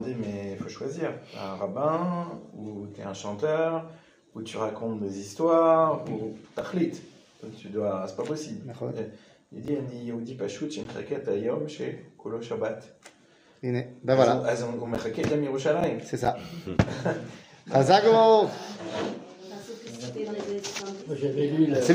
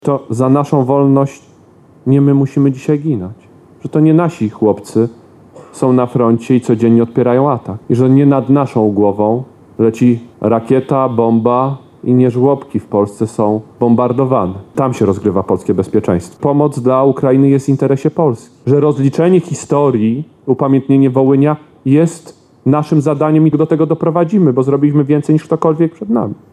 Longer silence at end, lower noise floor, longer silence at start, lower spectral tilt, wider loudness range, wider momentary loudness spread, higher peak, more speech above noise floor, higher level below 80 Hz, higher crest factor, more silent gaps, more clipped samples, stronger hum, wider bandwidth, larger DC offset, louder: second, 0 s vs 0.2 s; first, -59 dBFS vs -43 dBFS; about the same, 0 s vs 0.05 s; second, -6 dB/octave vs -9 dB/octave; first, 10 LU vs 2 LU; first, 18 LU vs 7 LU; second, -6 dBFS vs 0 dBFS; about the same, 32 dB vs 32 dB; about the same, -58 dBFS vs -54 dBFS; first, 22 dB vs 12 dB; neither; neither; neither; first, 15.5 kHz vs 11.5 kHz; neither; second, -28 LUFS vs -13 LUFS